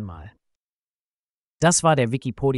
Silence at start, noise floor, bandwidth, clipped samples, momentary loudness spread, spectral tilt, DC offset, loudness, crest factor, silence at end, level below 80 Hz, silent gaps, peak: 0 s; under -90 dBFS; 11.5 kHz; under 0.1%; 9 LU; -4.5 dB/octave; under 0.1%; -20 LUFS; 18 dB; 0 s; -50 dBFS; 0.56-1.58 s; -6 dBFS